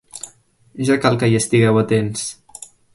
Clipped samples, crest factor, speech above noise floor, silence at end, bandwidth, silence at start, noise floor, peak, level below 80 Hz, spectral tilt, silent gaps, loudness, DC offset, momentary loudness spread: under 0.1%; 18 dB; 34 dB; 0.3 s; 11.5 kHz; 0.15 s; -50 dBFS; -2 dBFS; -52 dBFS; -5.5 dB/octave; none; -17 LUFS; under 0.1%; 21 LU